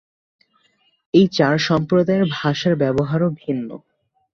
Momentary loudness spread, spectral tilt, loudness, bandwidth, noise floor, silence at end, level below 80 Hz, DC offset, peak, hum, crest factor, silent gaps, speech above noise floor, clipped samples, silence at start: 10 LU; -6.5 dB/octave; -18 LUFS; 7.2 kHz; -62 dBFS; 0.55 s; -54 dBFS; under 0.1%; -2 dBFS; none; 18 dB; none; 45 dB; under 0.1%; 1.15 s